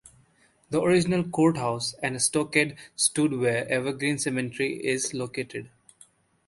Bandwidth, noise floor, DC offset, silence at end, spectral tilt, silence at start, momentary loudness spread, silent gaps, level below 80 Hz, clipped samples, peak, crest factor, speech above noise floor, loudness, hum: 12 kHz; -63 dBFS; under 0.1%; 0.8 s; -4 dB/octave; 0.7 s; 8 LU; none; -62 dBFS; under 0.1%; -6 dBFS; 22 dB; 37 dB; -26 LUFS; none